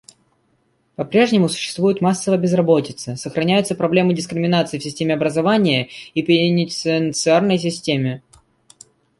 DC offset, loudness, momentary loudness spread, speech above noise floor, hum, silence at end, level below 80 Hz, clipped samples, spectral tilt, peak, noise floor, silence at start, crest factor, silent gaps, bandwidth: under 0.1%; -18 LUFS; 9 LU; 46 dB; none; 1 s; -60 dBFS; under 0.1%; -5.5 dB/octave; -2 dBFS; -63 dBFS; 1 s; 16 dB; none; 11.5 kHz